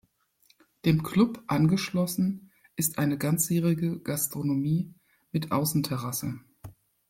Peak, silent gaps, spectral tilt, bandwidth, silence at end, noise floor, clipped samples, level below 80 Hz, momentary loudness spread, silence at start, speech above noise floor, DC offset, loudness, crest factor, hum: -10 dBFS; none; -5.5 dB/octave; 16.5 kHz; 0.4 s; -66 dBFS; under 0.1%; -60 dBFS; 9 LU; 0.85 s; 40 dB; under 0.1%; -27 LUFS; 18 dB; none